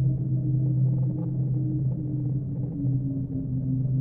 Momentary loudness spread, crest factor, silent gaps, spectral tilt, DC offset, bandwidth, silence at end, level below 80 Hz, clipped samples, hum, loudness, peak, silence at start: 5 LU; 10 dB; none; -15.5 dB/octave; under 0.1%; 1 kHz; 0 s; -46 dBFS; under 0.1%; none; -27 LUFS; -16 dBFS; 0 s